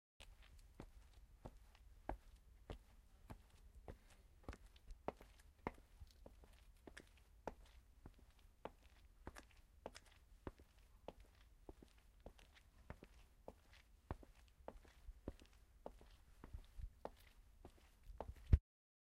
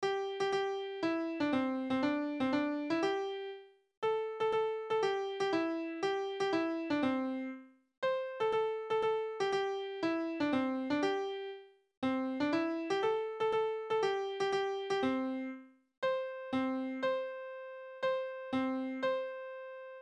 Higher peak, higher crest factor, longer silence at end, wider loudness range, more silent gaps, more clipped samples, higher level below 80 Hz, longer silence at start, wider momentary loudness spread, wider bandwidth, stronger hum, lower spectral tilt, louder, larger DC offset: about the same, -20 dBFS vs -20 dBFS; first, 34 dB vs 14 dB; first, 0.4 s vs 0 s; about the same, 5 LU vs 3 LU; second, none vs 3.97-4.02 s, 7.97-8.02 s, 11.97-12.02 s, 15.97-16.02 s; neither; first, -56 dBFS vs -76 dBFS; first, 0.2 s vs 0 s; first, 14 LU vs 9 LU; first, 15 kHz vs 10.5 kHz; neither; first, -7 dB/octave vs -5 dB/octave; second, -54 LUFS vs -35 LUFS; neither